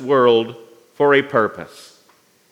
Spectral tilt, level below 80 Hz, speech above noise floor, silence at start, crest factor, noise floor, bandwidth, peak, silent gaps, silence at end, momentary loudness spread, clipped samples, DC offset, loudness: -6 dB/octave; -72 dBFS; 39 dB; 0 s; 18 dB; -56 dBFS; 12 kHz; -2 dBFS; none; 0.85 s; 19 LU; under 0.1%; under 0.1%; -16 LUFS